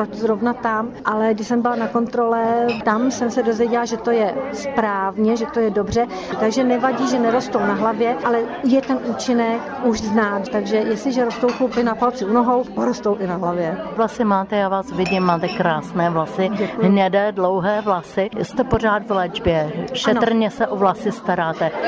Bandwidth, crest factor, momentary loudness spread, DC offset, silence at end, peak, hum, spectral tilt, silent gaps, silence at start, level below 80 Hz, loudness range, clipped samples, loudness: 8 kHz; 16 dB; 4 LU; under 0.1%; 0 s; -4 dBFS; none; -6 dB/octave; none; 0 s; -46 dBFS; 1 LU; under 0.1%; -19 LUFS